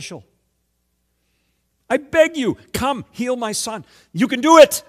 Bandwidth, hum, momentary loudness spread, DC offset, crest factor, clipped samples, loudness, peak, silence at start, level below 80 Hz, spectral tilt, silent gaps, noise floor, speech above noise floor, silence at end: 15 kHz; none; 21 LU; under 0.1%; 18 dB; 0.3%; -17 LUFS; 0 dBFS; 0 s; -50 dBFS; -3.5 dB/octave; none; -69 dBFS; 52 dB; 0.1 s